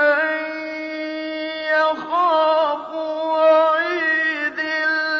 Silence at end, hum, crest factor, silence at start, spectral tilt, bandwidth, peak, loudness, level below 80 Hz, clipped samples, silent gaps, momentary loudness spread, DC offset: 0 s; none; 14 dB; 0 s; -3.5 dB/octave; 6.4 kHz; -6 dBFS; -19 LUFS; -70 dBFS; under 0.1%; none; 11 LU; under 0.1%